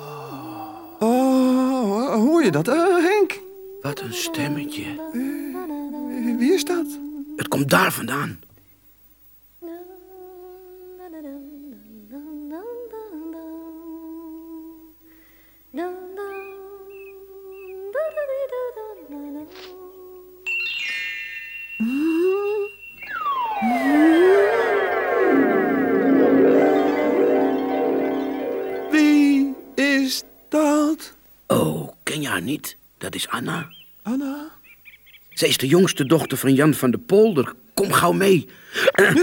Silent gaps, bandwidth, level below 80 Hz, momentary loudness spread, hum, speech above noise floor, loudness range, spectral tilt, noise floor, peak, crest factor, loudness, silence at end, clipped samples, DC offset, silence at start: none; 19 kHz; -62 dBFS; 21 LU; none; 34 dB; 18 LU; -5 dB/octave; -53 dBFS; -2 dBFS; 20 dB; -20 LUFS; 0 s; under 0.1%; under 0.1%; 0 s